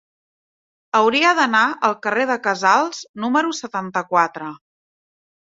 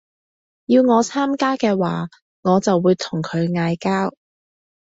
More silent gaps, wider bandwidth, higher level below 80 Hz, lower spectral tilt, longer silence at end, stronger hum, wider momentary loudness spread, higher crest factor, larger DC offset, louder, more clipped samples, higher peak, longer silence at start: second, 3.09-3.14 s vs 2.22-2.43 s; about the same, 8 kHz vs 8 kHz; second, -70 dBFS vs -60 dBFS; second, -3 dB/octave vs -6 dB/octave; first, 1 s vs 0.75 s; neither; about the same, 11 LU vs 10 LU; about the same, 18 dB vs 16 dB; neither; about the same, -18 LUFS vs -19 LUFS; neither; about the same, -2 dBFS vs -4 dBFS; first, 0.95 s vs 0.7 s